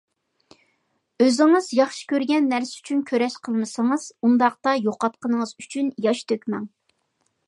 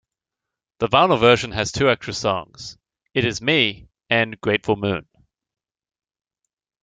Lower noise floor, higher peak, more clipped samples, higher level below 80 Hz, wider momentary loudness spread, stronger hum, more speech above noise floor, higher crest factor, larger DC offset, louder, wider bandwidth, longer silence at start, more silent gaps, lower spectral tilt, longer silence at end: second, -71 dBFS vs -86 dBFS; about the same, -4 dBFS vs -2 dBFS; neither; second, -76 dBFS vs -52 dBFS; second, 9 LU vs 12 LU; neither; second, 50 dB vs 66 dB; about the same, 18 dB vs 22 dB; neither; about the same, -22 LUFS vs -20 LUFS; first, 11.5 kHz vs 9.4 kHz; first, 1.2 s vs 0.8 s; neither; about the same, -4.5 dB/octave vs -4.5 dB/octave; second, 0.8 s vs 1.8 s